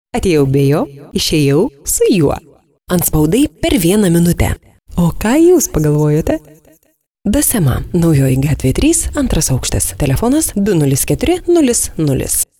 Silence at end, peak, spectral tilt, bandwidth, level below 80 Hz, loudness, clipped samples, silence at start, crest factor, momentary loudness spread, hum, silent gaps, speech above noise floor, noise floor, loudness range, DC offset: 0.15 s; -2 dBFS; -5 dB/octave; 18.5 kHz; -26 dBFS; -13 LUFS; under 0.1%; 0.15 s; 12 dB; 6 LU; none; 7.10-7.15 s; 46 dB; -58 dBFS; 2 LU; under 0.1%